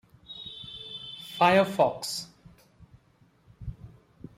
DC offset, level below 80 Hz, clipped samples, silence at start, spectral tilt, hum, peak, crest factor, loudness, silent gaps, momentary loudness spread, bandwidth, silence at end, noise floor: under 0.1%; -56 dBFS; under 0.1%; 0.3 s; -4.5 dB/octave; none; -10 dBFS; 20 dB; -27 LUFS; none; 22 LU; 16 kHz; 0.5 s; -63 dBFS